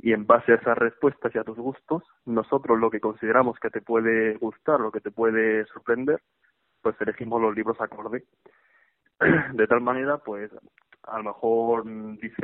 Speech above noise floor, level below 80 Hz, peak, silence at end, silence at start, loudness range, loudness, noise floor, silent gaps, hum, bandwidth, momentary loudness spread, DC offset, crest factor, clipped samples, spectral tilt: 40 dB; -64 dBFS; -2 dBFS; 0 s; 0.05 s; 4 LU; -24 LUFS; -65 dBFS; none; none; 3.9 kHz; 13 LU; under 0.1%; 22 dB; under 0.1%; -5.5 dB/octave